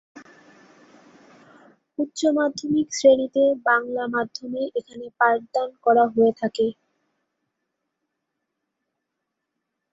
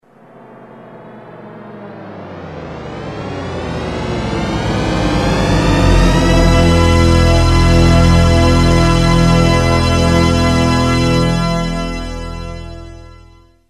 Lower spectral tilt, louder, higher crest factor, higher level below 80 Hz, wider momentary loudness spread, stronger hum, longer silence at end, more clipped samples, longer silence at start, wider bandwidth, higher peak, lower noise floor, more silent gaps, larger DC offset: second, -4 dB/octave vs -6 dB/octave; second, -22 LUFS vs -13 LUFS; first, 20 dB vs 12 dB; second, -70 dBFS vs -20 dBFS; second, 12 LU vs 19 LU; neither; first, 3.2 s vs 0.6 s; neither; second, 0.15 s vs 0.6 s; second, 8 kHz vs 13 kHz; second, -4 dBFS vs 0 dBFS; first, -81 dBFS vs -43 dBFS; neither; neither